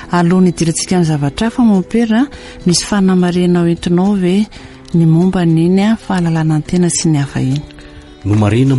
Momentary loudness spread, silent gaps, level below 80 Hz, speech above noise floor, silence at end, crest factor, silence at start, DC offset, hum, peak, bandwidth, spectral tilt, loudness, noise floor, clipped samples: 6 LU; none; -38 dBFS; 23 dB; 0 s; 10 dB; 0 s; under 0.1%; none; -2 dBFS; 11.5 kHz; -6 dB/octave; -13 LUFS; -34 dBFS; under 0.1%